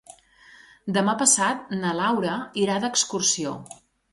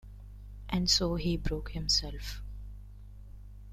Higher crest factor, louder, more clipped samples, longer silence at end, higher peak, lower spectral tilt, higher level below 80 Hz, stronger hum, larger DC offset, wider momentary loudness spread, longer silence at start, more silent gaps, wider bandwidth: about the same, 22 dB vs 20 dB; first, -23 LUFS vs -30 LUFS; neither; first, 0.4 s vs 0 s; first, -4 dBFS vs -14 dBFS; about the same, -2.5 dB/octave vs -3.5 dB/octave; second, -66 dBFS vs -42 dBFS; second, none vs 50 Hz at -40 dBFS; neither; second, 10 LU vs 25 LU; first, 0.85 s vs 0.05 s; neither; second, 11.5 kHz vs 15 kHz